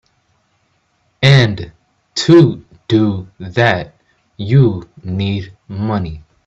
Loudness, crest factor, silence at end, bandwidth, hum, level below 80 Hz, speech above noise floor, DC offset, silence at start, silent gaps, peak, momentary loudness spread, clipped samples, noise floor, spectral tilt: -14 LUFS; 16 dB; 0.25 s; 7.8 kHz; none; -44 dBFS; 47 dB; under 0.1%; 1.2 s; none; 0 dBFS; 18 LU; under 0.1%; -61 dBFS; -6.5 dB/octave